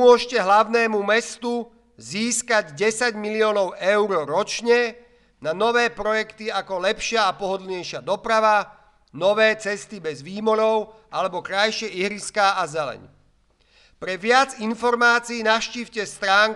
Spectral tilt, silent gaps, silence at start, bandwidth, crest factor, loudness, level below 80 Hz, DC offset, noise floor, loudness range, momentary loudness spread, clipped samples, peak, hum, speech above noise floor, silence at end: -2.5 dB/octave; none; 0 s; 12 kHz; 18 dB; -21 LUFS; -58 dBFS; under 0.1%; -61 dBFS; 2 LU; 12 LU; under 0.1%; -4 dBFS; none; 39 dB; 0 s